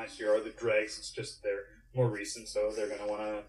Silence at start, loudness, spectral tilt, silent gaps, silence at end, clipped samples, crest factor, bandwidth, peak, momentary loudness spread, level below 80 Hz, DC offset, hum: 0 s; -34 LUFS; -5 dB/octave; none; 0 s; under 0.1%; 18 dB; 12.5 kHz; -16 dBFS; 8 LU; -62 dBFS; under 0.1%; none